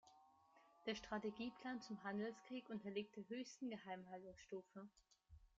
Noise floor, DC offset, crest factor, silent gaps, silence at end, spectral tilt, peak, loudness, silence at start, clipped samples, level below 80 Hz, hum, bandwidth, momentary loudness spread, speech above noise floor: -73 dBFS; under 0.1%; 18 dB; none; 0.15 s; -4 dB/octave; -34 dBFS; -51 LUFS; 0.05 s; under 0.1%; -78 dBFS; none; 7.6 kHz; 9 LU; 22 dB